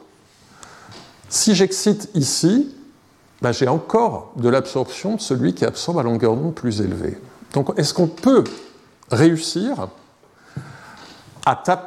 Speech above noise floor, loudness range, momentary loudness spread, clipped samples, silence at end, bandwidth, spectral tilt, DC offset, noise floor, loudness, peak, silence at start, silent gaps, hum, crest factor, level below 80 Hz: 34 dB; 2 LU; 19 LU; under 0.1%; 0 s; 15 kHz; -5 dB/octave; under 0.1%; -53 dBFS; -19 LUFS; -2 dBFS; 0.7 s; none; none; 18 dB; -56 dBFS